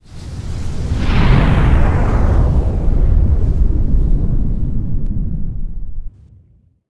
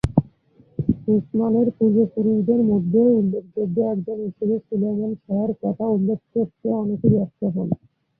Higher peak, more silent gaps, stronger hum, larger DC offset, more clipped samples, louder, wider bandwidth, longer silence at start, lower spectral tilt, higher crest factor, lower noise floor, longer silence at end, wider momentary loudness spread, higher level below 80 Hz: about the same, 0 dBFS vs -2 dBFS; neither; neither; neither; neither; first, -17 LUFS vs -21 LUFS; first, 7.8 kHz vs 3.7 kHz; about the same, 0.05 s vs 0.05 s; second, -8 dB/octave vs -11.5 dB/octave; about the same, 14 dB vs 18 dB; second, -51 dBFS vs -55 dBFS; about the same, 0.5 s vs 0.45 s; first, 15 LU vs 8 LU; first, -16 dBFS vs -46 dBFS